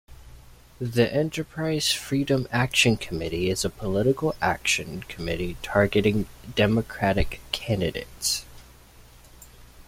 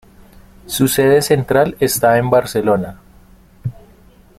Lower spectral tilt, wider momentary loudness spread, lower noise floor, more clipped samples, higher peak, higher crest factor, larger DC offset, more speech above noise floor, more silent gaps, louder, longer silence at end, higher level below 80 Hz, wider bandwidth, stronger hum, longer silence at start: about the same, -4.5 dB/octave vs -5 dB/octave; second, 8 LU vs 17 LU; first, -50 dBFS vs -46 dBFS; neither; second, -6 dBFS vs 0 dBFS; about the same, 20 dB vs 16 dB; neither; second, 25 dB vs 32 dB; neither; second, -25 LUFS vs -15 LUFS; second, 0.05 s vs 0.65 s; about the same, -42 dBFS vs -44 dBFS; about the same, 16.5 kHz vs 16.5 kHz; neither; second, 0.1 s vs 0.65 s